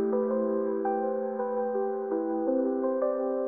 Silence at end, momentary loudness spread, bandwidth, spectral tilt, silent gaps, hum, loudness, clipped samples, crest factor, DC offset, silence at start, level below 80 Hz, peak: 0 s; 3 LU; 2.5 kHz; -3 dB/octave; none; none; -29 LUFS; under 0.1%; 12 dB; under 0.1%; 0 s; -84 dBFS; -16 dBFS